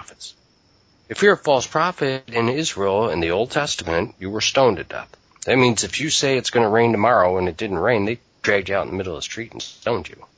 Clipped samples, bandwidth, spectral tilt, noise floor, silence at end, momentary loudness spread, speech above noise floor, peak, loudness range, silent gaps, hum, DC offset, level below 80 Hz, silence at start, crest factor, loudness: under 0.1%; 8 kHz; -4 dB/octave; -58 dBFS; 0.1 s; 12 LU; 38 dB; -2 dBFS; 3 LU; none; none; under 0.1%; -48 dBFS; 0 s; 18 dB; -20 LUFS